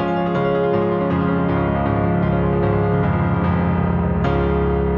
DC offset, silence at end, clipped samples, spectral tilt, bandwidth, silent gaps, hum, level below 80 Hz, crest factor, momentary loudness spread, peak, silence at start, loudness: under 0.1%; 0 s; under 0.1%; -10.5 dB/octave; 4.6 kHz; none; none; -30 dBFS; 12 dB; 1 LU; -6 dBFS; 0 s; -19 LUFS